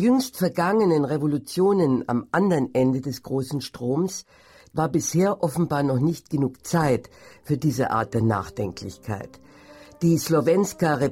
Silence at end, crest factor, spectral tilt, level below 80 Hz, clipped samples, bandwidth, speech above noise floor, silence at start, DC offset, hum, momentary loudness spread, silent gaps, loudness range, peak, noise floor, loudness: 0 s; 14 dB; -6.5 dB/octave; -54 dBFS; under 0.1%; 16.5 kHz; 25 dB; 0 s; under 0.1%; none; 10 LU; none; 4 LU; -8 dBFS; -48 dBFS; -23 LUFS